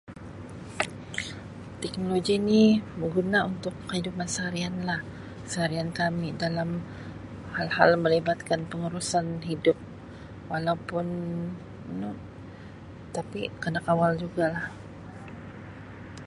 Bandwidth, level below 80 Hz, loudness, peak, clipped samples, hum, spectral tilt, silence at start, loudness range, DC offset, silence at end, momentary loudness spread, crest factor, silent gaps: 11.5 kHz; -54 dBFS; -28 LUFS; -4 dBFS; under 0.1%; none; -5.5 dB/octave; 0.05 s; 6 LU; under 0.1%; 0 s; 20 LU; 26 dB; none